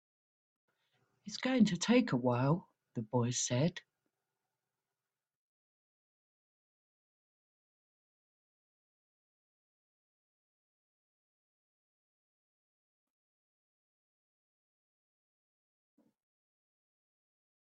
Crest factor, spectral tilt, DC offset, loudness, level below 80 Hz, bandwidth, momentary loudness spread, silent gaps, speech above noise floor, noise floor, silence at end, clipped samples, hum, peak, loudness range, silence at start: 24 dB; -5 dB/octave; under 0.1%; -33 LUFS; -80 dBFS; 8.4 kHz; 16 LU; none; over 58 dB; under -90 dBFS; 13.9 s; under 0.1%; none; -16 dBFS; 7 LU; 1.25 s